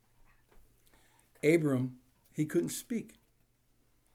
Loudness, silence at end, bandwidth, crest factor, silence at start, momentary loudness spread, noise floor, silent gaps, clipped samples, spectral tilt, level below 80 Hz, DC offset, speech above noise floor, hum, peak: -32 LUFS; 1.05 s; 16.5 kHz; 22 dB; 1.45 s; 13 LU; -71 dBFS; none; under 0.1%; -6 dB/octave; -70 dBFS; under 0.1%; 40 dB; none; -14 dBFS